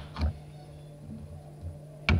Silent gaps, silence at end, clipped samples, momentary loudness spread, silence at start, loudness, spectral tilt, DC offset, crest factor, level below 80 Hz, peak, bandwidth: none; 0 s; under 0.1%; 13 LU; 0 s; -39 LUFS; -6.5 dB/octave; under 0.1%; 24 dB; -40 dBFS; -10 dBFS; 10.5 kHz